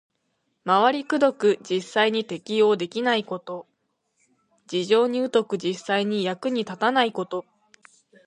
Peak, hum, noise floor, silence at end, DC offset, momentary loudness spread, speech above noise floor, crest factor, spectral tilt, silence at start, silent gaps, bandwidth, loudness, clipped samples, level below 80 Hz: -6 dBFS; none; -74 dBFS; 0.85 s; under 0.1%; 11 LU; 51 dB; 20 dB; -5 dB/octave; 0.65 s; none; 10 kHz; -23 LUFS; under 0.1%; -78 dBFS